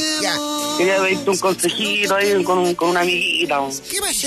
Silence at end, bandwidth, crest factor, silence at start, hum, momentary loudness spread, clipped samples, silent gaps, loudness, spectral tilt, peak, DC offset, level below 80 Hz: 0 s; 14 kHz; 12 dB; 0 s; none; 5 LU; under 0.1%; none; -18 LUFS; -2.5 dB/octave; -6 dBFS; under 0.1%; -56 dBFS